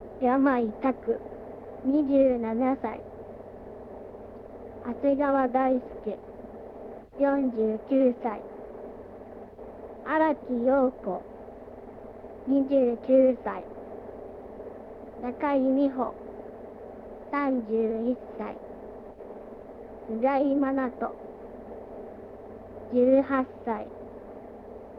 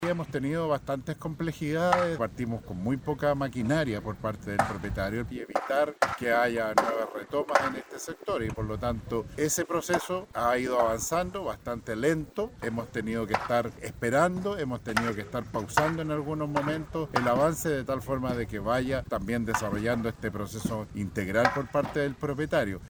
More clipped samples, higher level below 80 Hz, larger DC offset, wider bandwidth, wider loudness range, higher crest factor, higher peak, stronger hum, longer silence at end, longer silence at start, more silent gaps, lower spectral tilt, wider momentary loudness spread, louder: neither; second, -58 dBFS vs -50 dBFS; neither; second, 4.9 kHz vs over 20 kHz; about the same, 4 LU vs 2 LU; about the same, 18 dB vs 22 dB; second, -10 dBFS vs -6 dBFS; neither; about the same, 0 s vs 0 s; about the same, 0 s vs 0 s; neither; first, -9 dB/octave vs -5.5 dB/octave; first, 21 LU vs 8 LU; about the same, -27 LUFS vs -29 LUFS